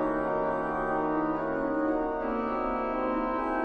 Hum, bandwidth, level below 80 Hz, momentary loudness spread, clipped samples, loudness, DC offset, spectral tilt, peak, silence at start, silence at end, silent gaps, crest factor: none; 5.6 kHz; -48 dBFS; 2 LU; under 0.1%; -29 LUFS; under 0.1%; -8.5 dB/octave; -16 dBFS; 0 s; 0 s; none; 12 dB